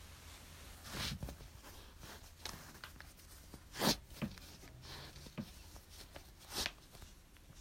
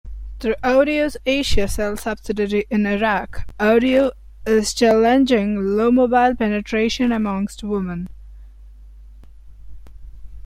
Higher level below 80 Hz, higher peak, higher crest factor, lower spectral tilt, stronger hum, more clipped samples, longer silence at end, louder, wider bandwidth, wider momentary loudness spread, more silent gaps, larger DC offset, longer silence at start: second, -58 dBFS vs -36 dBFS; second, -16 dBFS vs -4 dBFS; first, 32 dB vs 16 dB; second, -3 dB/octave vs -5 dB/octave; neither; neither; about the same, 0 s vs 0.05 s; second, -45 LUFS vs -19 LUFS; about the same, 16 kHz vs 16 kHz; first, 17 LU vs 10 LU; neither; neither; about the same, 0 s vs 0.05 s